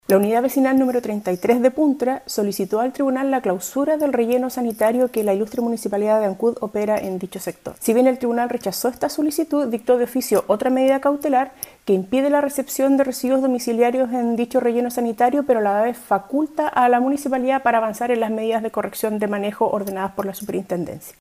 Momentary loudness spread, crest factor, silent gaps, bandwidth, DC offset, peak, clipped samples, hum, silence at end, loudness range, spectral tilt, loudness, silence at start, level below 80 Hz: 7 LU; 16 dB; none; 15.5 kHz; under 0.1%; -4 dBFS; under 0.1%; none; 0.1 s; 2 LU; -5 dB/octave; -20 LUFS; 0.1 s; -60 dBFS